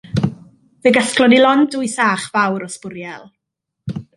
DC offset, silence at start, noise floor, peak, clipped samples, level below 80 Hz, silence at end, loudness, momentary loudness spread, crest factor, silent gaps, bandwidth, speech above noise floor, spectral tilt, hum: under 0.1%; 0.15 s; -79 dBFS; -2 dBFS; under 0.1%; -50 dBFS; 0.15 s; -15 LUFS; 19 LU; 16 dB; none; 11.5 kHz; 64 dB; -4.5 dB/octave; none